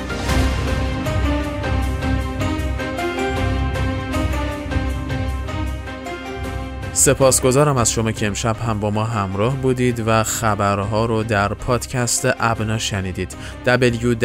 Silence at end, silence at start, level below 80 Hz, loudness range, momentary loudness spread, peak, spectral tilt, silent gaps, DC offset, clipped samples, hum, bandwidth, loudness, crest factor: 0 s; 0 s; -28 dBFS; 5 LU; 10 LU; -2 dBFS; -4.5 dB/octave; none; under 0.1%; under 0.1%; none; 16 kHz; -20 LUFS; 18 dB